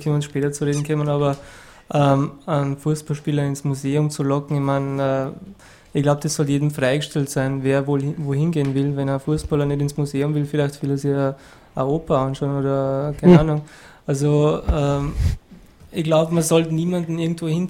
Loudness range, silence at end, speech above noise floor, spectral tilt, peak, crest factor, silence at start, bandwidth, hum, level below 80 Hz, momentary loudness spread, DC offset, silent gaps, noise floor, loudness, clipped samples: 3 LU; 0 s; 25 dB; -7 dB/octave; 0 dBFS; 20 dB; 0 s; 16 kHz; none; -38 dBFS; 7 LU; under 0.1%; none; -45 dBFS; -21 LUFS; under 0.1%